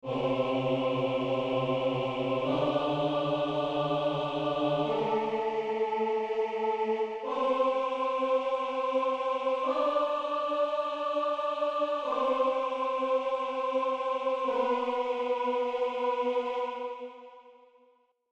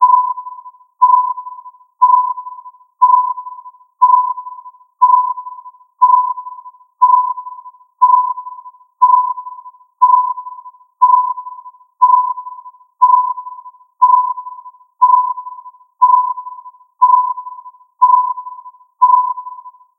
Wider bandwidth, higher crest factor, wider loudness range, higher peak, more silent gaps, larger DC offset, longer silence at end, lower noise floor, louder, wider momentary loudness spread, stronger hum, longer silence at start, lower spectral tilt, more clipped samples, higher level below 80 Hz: first, 8.2 kHz vs 1.2 kHz; about the same, 14 dB vs 14 dB; about the same, 1 LU vs 0 LU; second, -16 dBFS vs 0 dBFS; neither; neither; first, 0.8 s vs 0.3 s; first, -66 dBFS vs -36 dBFS; second, -30 LUFS vs -13 LUFS; second, 3 LU vs 21 LU; neither; about the same, 0.05 s vs 0 s; first, -6.5 dB/octave vs 1 dB/octave; neither; first, -68 dBFS vs under -90 dBFS